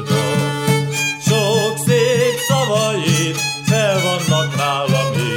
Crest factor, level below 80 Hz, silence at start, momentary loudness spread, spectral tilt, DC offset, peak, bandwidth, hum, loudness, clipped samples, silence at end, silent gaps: 12 dB; -56 dBFS; 0 s; 3 LU; -4.5 dB/octave; under 0.1%; -4 dBFS; 17.5 kHz; none; -16 LUFS; under 0.1%; 0 s; none